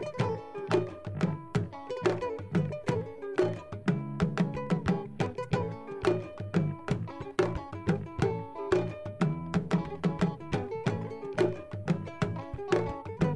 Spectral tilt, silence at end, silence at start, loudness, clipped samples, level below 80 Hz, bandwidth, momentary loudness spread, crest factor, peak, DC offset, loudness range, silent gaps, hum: -7.5 dB/octave; 0 s; 0 s; -32 LUFS; under 0.1%; -52 dBFS; 11 kHz; 5 LU; 20 dB; -12 dBFS; under 0.1%; 1 LU; none; none